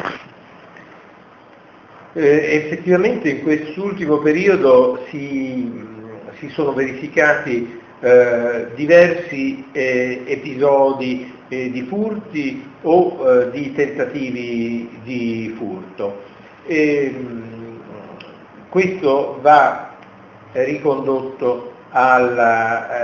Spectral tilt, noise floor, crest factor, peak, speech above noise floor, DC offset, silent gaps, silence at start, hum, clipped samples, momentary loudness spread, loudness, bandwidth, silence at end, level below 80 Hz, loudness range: -6.5 dB/octave; -44 dBFS; 18 dB; 0 dBFS; 28 dB; under 0.1%; none; 0 s; none; under 0.1%; 17 LU; -17 LUFS; 7 kHz; 0 s; -58 dBFS; 7 LU